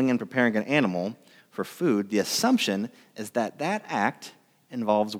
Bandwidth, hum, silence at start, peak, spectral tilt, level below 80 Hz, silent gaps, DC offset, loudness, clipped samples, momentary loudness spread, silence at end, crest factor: 16.5 kHz; none; 0 s; -8 dBFS; -4.5 dB/octave; -82 dBFS; none; under 0.1%; -26 LUFS; under 0.1%; 15 LU; 0 s; 20 dB